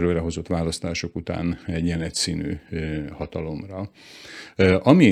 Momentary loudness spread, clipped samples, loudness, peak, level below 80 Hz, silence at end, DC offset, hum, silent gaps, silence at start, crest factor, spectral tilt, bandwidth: 16 LU; under 0.1%; -24 LUFS; 0 dBFS; -46 dBFS; 0 s; under 0.1%; none; none; 0 s; 22 dB; -5.5 dB/octave; 13.5 kHz